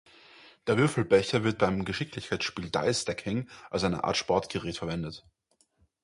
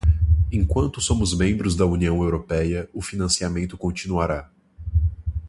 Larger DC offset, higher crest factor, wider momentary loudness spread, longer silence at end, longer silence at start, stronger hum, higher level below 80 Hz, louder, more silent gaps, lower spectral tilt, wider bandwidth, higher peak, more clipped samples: neither; about the same, 20 dB vs 16 dB; first, 10 LU vs 7 LU; first, 0.85 s vs 0 s; first, 0.45 s vs 0.05 s; neither; second, -54 dBFS vs -26 dBFS; second, -29 LUFS vs -23 LUFS; neither; about the same, -5 dB/octave vs -5.5 dB/octave; about the same, 11.5 kHz vs 11.5 kHz; second, -10 dBFS vs -6 dBFS; neither